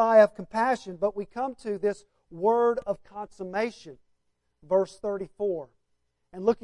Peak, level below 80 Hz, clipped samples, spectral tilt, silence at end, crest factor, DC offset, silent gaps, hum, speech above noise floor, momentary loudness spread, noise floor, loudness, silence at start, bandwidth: -8 dBFS; -64 dBFS; under 0.1%; -6 dB/octave; 0.1 s; 20 dB; under 0.1%; none; none; 48 dB; 13 LU; -74 dBFS; -28 LUFS; 0 s; 11 kHz